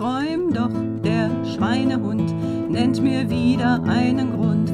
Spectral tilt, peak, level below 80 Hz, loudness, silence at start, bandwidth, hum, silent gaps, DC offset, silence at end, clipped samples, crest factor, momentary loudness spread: -7.5 dB/octave; -6 dBFS; -52 dBFS; -21 LUFS; 0 s; 10.5 kHz; none; none; under 0.1%; 0 s; under 0.1%; 14 dB; 4 LU